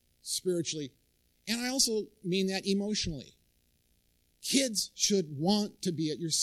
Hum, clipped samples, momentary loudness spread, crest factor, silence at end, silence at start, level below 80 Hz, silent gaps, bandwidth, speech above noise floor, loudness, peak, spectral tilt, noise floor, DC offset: none; under 0.1%; 9 LU; 24 dB; 0 s; 0.25 s; -60 dBFS; none; 15.5 kHz; 40 dB; -31 LUFS; -10 dBFS; -3.5 dB/octave; -71 dBFS; under 0.1%